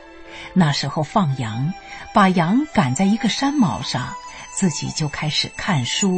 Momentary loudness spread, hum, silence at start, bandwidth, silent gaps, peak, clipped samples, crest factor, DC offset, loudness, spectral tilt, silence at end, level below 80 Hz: 11 LU; none; 0 s; 8.8 kHz; none; -4 dBFS; under 0.1%; 16 dB; under 0.1%; -20 LUFS; -4.5 dB/octave; 0 s; -48 dBFS